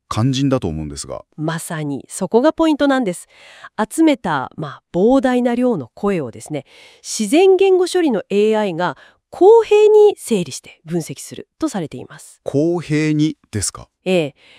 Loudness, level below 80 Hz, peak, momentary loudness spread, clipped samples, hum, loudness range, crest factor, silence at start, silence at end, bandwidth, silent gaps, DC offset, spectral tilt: -17 LUFS; -50 dBFS; 0 dBFS; 17 LU; under 0.1%; none; 7 LU; 16 dB; 0.1 s; 0.3 s; 15.5 kHz; none; under 0.1%; -5.5 dB/octave